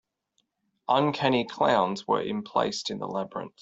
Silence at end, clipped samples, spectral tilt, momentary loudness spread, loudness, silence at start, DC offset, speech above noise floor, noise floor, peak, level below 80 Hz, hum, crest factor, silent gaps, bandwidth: 0.15 s; under 0.1%; -5 dB/octave; 9 LU; -27 LUFS; 0.9 s; under 0.1%; 49 dB; -75 dBFS; -8 dBFS; -66 dBFS; none; 20 dB; none; 8.2 kHz